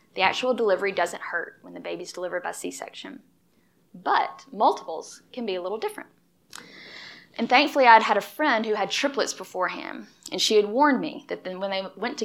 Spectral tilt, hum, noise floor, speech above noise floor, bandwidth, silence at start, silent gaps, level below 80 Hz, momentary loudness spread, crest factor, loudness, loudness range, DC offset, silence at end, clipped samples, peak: -2.5 dB/octave; none; -64 dBFS; 40 dB; 16 kHz; 0.15 s; none; -80 dBFS; 20 LU; 24 dB; -24 LUFS; 9 LU; under 0.1%; 0 s; under 0.1%; -2 dBFS